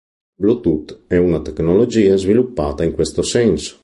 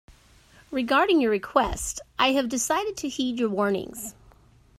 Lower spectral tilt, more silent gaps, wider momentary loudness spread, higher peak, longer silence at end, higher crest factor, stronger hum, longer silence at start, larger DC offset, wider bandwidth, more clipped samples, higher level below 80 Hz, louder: first, -6 dB/octave vs -3 dB/octave; neither; second, 7 LU vs 11 LU; first, -2 dBFS vs -6 dBFS; second, 0.1 s vs 0.7 s; second, 14 dB vs 20 dB; neither; second, 0.4 s vs 0.7 s; neither; second, 11.5 kHz vs 16 kHz; neither; first, -36 dBFS vs -48 dBFS; first, -16 LUFS vs -25 LUFS